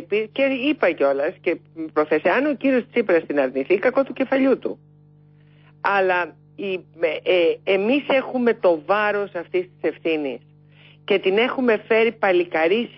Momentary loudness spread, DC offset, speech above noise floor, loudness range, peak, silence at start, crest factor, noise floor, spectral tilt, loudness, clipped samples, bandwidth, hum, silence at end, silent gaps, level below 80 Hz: 8 LU; under 0.1%; 31 dB; 2 LU; -6 dBFS; 0 s; 16 dB; -51 dBFS; -9.5 dB/octave; -21 LUFS; under 0.1%; 5.8 kHz; 50 Hz at -50 dBFS; 0.1 s; none; -70 dBFS